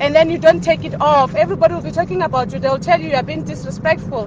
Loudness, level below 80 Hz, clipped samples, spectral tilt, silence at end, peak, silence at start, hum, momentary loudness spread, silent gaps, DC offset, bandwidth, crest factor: -16 LUFS; -42 dBFS; under 0.1%; -6 dB/octave; 0 s; 0 dBFS; 0 s; none; 8 LU; none; under 0.1%; 7.8 kHz; 16 dB